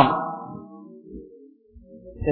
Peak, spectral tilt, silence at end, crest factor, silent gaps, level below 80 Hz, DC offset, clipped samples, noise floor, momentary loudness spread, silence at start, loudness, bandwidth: -2 dBFS; -10 dB/octave; 0 s; 24 dB; none; -48 dBFS; under 0.1%; under 0.1%; -50 dBFS; 22 LU; 0 s; -27 LUFS; 4.5 kHz